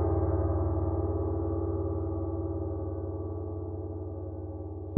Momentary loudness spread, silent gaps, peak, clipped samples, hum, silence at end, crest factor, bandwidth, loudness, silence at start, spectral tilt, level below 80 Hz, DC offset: 10 LU; none; -10 dBFS; under 0.1%; none; 0 s; 20 dB; 2 kHz; -33 LUFS; 0 s; -15 dB/octave; -40 dBFS; under 0.1%